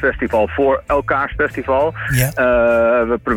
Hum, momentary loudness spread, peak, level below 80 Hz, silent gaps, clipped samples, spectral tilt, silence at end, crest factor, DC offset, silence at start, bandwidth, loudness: none; 5 LU; -4 dBFS; -34 dBFS; none; under 0.1%; -6 dB/octave; 0 s; 12 dB; under 0.1%; 0 s; 19 kHz; -16 LUFS